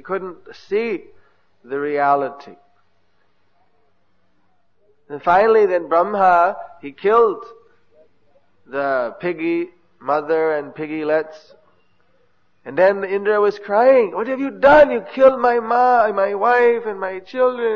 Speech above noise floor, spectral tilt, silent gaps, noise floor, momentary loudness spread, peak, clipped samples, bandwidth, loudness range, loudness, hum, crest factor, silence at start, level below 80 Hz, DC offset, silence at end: 49 dB; -7 dB/octave; none; -66 dBFS; 14 LU; -2 dBFS; under 0.1%; 6.6 kHz; 10 LU; -17 LUFS; none; 18 dB; 0.05 s; -56 dBFS; 0.2%; 0 s